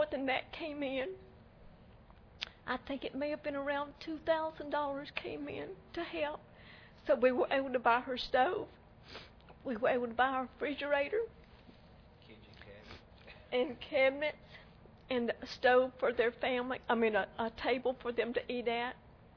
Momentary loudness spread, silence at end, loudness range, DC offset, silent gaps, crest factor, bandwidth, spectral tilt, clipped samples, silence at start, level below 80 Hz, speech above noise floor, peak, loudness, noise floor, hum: 21 LU; 0.25 s; 7 LU; under 0.1%; none; 20 dB; 5.4 kHz; -5.5 dB/octave; under 0.1%; 0 s; -64 dBFS; 24 dB; -16 dBFS; -35 LUFS; -59 dBFS; none